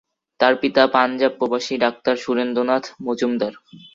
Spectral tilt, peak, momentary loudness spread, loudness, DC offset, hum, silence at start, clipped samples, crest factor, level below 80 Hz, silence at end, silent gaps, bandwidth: -4.5 dB/octave; -2 dBFS; 7 LU; -20 LUFS; under 0.1%; none; 0.4 s; under 0.1%; 18 dB; -64 dBFS; 0.2 s; none; 7.6 kHz